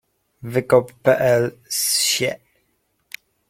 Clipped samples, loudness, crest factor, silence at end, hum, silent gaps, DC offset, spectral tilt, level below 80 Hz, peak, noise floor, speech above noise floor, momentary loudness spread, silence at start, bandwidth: under 0.1%; -19 LUFS; 20 dB; 1.15 s; none; none; under 0.1%; -3 dB/octave; -60 dBFS; -2 dBFS; -68 dBFS; 49 dB; 22 LU; 0.45 s; 16.5 kHz